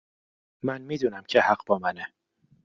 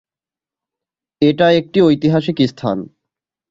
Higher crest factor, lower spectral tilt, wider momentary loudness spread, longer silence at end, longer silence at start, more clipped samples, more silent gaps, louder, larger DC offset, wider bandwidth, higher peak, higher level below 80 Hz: first, 22 dB vs 16 dB; second, -3 dB/octave vs -7.5 dB/octave; first, 13 LU vs 9 LU; about the same, 0.6 s vs 0.65 s; second, 0.65 s vs 1.2 s; neither; neither; second, -26 LUFS vs -15 LUFS; neither; about the same, 7.4 kHz vs 7.6 kHz; second, -6 dBFS vs -2 dBFS; second, -70 dBFS vs -54 dBFS